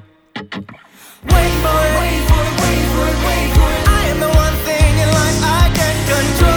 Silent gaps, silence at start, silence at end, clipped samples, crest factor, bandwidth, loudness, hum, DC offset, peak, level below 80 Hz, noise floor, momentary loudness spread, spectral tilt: none; 0.35 s; 0 s; under 0.1%; 12 dB; over 20 kHz; -14 LUFS; none; under 0.1%; 0 dBFS; -18 dBFS; -41 dBFS; 15 LU; -4.5 dB/octave